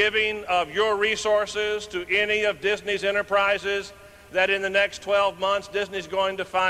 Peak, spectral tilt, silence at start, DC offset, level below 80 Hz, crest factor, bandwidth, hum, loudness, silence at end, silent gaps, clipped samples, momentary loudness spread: -8 dBFS; -2.5 dB/octave; 0 s; under 0.1%; -56 dBFS; 16 dB; 15 kHz; none; -24 LUFS; 0 s; none; under 0.1%; 7 LU